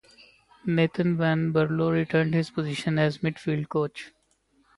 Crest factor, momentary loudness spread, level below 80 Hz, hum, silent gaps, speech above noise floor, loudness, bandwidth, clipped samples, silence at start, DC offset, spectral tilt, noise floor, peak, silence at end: 16 dB; 7 LU; -60 dBFS; none; none; 42 dB; -26 LUFS; 11.5 kHz; under 0.1%; 0.65 s; under 0.1%; -7.5 dB/octave; -67 dBFS; -10 dBFS; 0.7 s